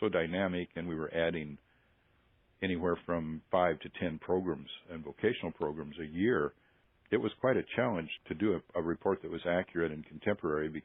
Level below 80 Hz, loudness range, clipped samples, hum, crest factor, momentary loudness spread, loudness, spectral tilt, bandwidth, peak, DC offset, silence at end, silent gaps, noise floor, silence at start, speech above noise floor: -66 dBFS; 2 LU; under 0.1%; none; 20 dB; 9 LU; -34 LUFS; -5 dB/octave; 4 kHz; -14 dBFS; under 0.1%; 0.05 s; none; -70 dBFS; 0 s; 36 dB